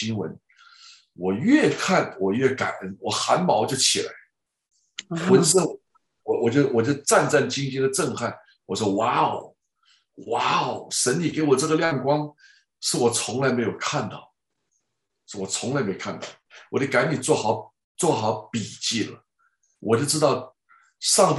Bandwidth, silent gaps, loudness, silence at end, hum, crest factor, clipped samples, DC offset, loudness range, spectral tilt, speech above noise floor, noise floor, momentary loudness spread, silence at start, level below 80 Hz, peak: 11.5 kHz; 17.84-17.95 s; -23 LUFS; 0 s; none; 20 dB; under 0.1%; under 0.1%; 5 LU; -4 dB/octave; 56 dB; -79 dBFS; 14 LU; 0 s; -66 dBFS; -4 dBFS